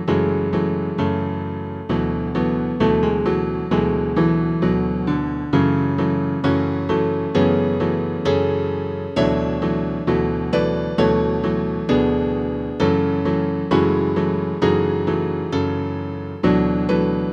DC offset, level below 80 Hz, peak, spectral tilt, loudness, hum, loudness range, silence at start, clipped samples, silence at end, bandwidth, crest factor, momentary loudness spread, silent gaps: under 0.1%; -38 dBFS; -4 dBFS; -8.5 dB/octave; -20 LUFS; none; 1 LU; 0 s; under 0.1%; 0 s; 7.4 kHz; 16 dB; 5 LU; none